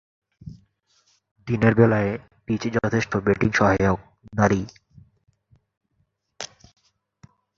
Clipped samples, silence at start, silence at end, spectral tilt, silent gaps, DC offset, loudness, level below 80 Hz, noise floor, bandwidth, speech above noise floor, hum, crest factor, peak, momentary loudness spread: under 0.1%; 0.45 s; 1.1 s; -7 dB/octave; 1.31-1.35 s, 5.77-5.81 s; under 0.1%; -22 LUFS; -46 dBFS; -71 dBFS; 7.4 kHz; 51 dB; none; 22 dB; -2 dBFS; 20 LU